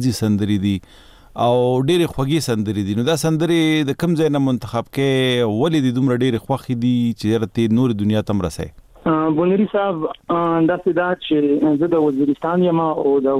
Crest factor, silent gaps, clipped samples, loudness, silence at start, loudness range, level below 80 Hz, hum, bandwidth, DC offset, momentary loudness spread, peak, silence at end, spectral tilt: 12 dB; none; under 0.1%; -18 LUFS; 0 s; 1 LU; -48 dBFS; none; 15.5 kHz; under 0.1%; 6 LU; -6 dBFS; 0 s; -6.5 dB/octave